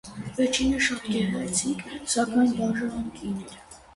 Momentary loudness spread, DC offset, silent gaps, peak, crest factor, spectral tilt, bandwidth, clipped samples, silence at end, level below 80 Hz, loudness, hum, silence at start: 12 LU; under 0.1%; none; -10 dBFS; 18 dB; -3.5 dB/octave; 11.5 kHz; under 0.1%; 0.15 s; -50 dBFS; -26 LUFS; none; 0.05 s